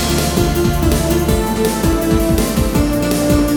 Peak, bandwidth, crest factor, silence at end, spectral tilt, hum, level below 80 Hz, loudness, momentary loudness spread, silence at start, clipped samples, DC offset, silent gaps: 0 dBFS; 19.5 kHz; 14 dB; 0 s; -5.5 dB/octave; none; -22 dBFS; -15 LUFS; 1 LU; 0 s; under 0.1%; 0.2%; none